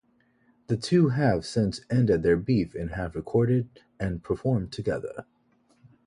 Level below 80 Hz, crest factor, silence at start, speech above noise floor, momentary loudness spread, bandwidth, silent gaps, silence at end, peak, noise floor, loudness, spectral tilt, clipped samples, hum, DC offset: -48 dBFS; 18 dB; 0.7 s; 39 dB; 11 LU; 11 kHz; none; 0.85 s; -8 dBFS; -65 dBFS; -26 LUFS; -7.5 dB/octave; under 0.1%; none; under 0.1%